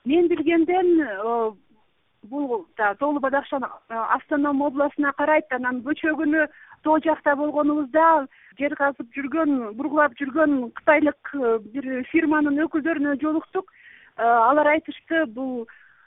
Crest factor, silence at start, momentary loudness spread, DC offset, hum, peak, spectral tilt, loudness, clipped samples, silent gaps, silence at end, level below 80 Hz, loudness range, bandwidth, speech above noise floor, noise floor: 18 dB; 0.05 s; 11 LU; under 0.1%; none; -4 dBFS; -9.5 dB/octave; -22 LUFS; under 0.1%; none; 0.45 s; -64 dBFS; 3 LU; 3.9 kHz; 43 dB; -65 dBFS